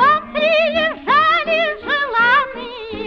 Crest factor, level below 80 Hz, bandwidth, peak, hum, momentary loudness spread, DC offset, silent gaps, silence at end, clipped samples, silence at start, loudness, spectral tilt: 14 dB; -48 dBFS; 7 kHz; -4 dBFS; none; 9 LU; under 0.1%; none; 0 s; under 0.1%; 0 s; -15 LUFS; -4.5 dB/octave